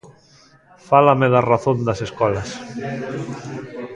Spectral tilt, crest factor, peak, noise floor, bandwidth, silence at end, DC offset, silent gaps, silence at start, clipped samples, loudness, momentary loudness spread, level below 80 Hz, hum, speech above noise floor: -7 dB/octave; 20 dB; 0 dBFS; -51 dBFS; 10.5 kHz; 0 s; under 0.1%; none; 0.05 s; under 0.1%; -19 LUFS; 16 LU; -50 dBFS; none; 33 dB